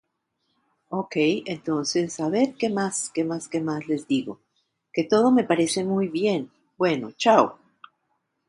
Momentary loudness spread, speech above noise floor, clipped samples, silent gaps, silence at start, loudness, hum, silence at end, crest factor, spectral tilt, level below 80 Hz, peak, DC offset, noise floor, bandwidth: 10 LU; 52 dB; under 0.1%; none; 0.9 s; -24 LUFS; none; 0.95 s; 20 dB; -4.5 dB/octave; -70 dBFS; -4 dBFS; under 0.1%; -75 dBFS; 11.5 kHz